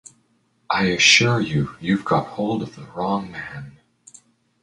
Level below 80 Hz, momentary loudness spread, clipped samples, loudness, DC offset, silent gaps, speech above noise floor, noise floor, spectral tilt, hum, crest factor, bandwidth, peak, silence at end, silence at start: -52 dBFS; 20 LU; under 0.1%; -19 LUFS; under 0.1%; none; 43 dB; -64 dBFS; -3.5 dB/octave; none; 22 dB; 11 kHz; 0 dBFS; 0.9 s; 0.7 s